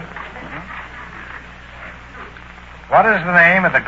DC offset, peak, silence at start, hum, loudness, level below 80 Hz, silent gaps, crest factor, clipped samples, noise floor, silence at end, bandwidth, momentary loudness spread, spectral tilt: under 0.1%; 0 dBFS; 0 s; 60 Hz at -45 dBFS; -12 LUFS; -42 dBFS; none; 18 dB; under 0.1%; -37 dBFS; 0 s; 7.8 kHz; 25 LU; -6.5 dB/octave